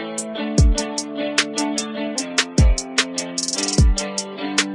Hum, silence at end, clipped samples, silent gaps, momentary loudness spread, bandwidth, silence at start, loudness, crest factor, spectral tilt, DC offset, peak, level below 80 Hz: none; 0 s; under 0.1%; none; 8 LU; 11.5 kHz; 0 s; -20 LUFS; 18 dB; -3.5 dB/octave; under 0.1%; -2 dBFS; -24 dBFS